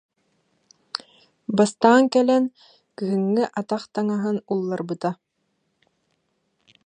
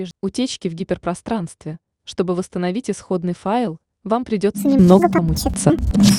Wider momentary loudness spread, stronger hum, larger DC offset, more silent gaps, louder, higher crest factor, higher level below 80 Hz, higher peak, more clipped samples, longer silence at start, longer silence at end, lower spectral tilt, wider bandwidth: first, 17 LU vs 14 LU; neither; neither; neither; second, -22 LUFS vs -19 LUFS; about the same, 22 dB vs 18 dB; second, -74 dBFS vs -34 dBFS; about the same, -2 dBFS vs 0 dBFS; neither; first, 0.95 s vs 0 s; first, 1.75 s vs 0 s; about the same, -6 dB/octave vs -6 dB/octave; second, 10 kHz vs 17.5 kHz